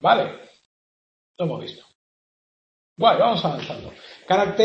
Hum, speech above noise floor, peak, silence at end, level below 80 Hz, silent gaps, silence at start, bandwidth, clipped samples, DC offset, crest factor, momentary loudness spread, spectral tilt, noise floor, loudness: none; over 69 dB; -2 dBFS; 0 s; -62 dBFS; 0.65-1.35 s, 1.95-2.96 s; 0 s; 8 kHz; under 0.1%; under 0.1%; 22 dB; 21 LU; -5.5 dB/octave; under -90 dBFS; -22 LUFS